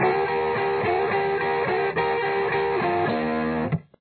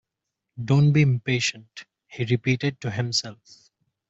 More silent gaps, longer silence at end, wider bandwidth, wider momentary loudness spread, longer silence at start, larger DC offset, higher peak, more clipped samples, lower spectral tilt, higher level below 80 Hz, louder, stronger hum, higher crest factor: neither; second, 0.2 s vs 0.75 s; second, 4.6 kHz vs 8 kHz; second, 2 LU vs 23 LU; second, 0 s vs 0.55 s; neither; about the same, -10 dBFS vs -8 dBFS; neither; first, -9.5 dB/octave vs -5.5 dB/octave; first, -52 dBFS vs -60 dBFS; about the same, -24 LUFS vs -23 LUFS; neither; second, 12 dB vs 18 dB